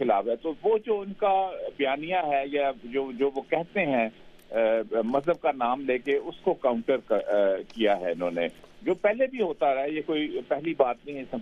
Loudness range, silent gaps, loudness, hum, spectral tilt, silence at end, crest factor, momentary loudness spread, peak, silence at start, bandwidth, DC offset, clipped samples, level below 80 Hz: 1 LU; none; -27 LUFS; none; -7 dB/octave; 0 s; 18 dB; 5 LU; -8 dBFS; 0 s; 7.2 kHz; under 0.1%; under 0.1%; -60 dBFS